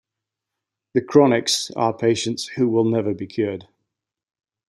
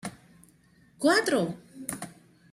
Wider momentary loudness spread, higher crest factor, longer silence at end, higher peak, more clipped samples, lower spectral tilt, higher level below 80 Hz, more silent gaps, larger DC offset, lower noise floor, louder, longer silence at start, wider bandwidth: second, 10 LU vs 18 LU; about the same, 20 dB vs 20 dB; first, 1.05 s vs 0.4 s; first, -2 dBFS vs -12 dBFS; neither; about the same, -4.5 dB/octave vs -4 dB/octave; about the same, -66 dBFS vs -68 dBFS; neither; neither; first, -84 dBFS vs -60 dBFS; first, -20 LUFS vs -27 LUFS; first, 0.95 s vs 0.05 s; about the same, 15 kHz vs 16 kHz